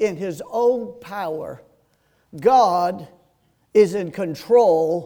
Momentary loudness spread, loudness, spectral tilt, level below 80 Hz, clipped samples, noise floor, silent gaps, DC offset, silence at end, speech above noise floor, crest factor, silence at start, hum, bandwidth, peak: 15 LU; -19 LUFS; -6 dB/octave; -62 dBFS; under 0.1%; -63 dBFS; none; under 0.1%; 0 s; 44 dB; 16 dB; 0 s; none; 18.5 kHz; -4 dBFS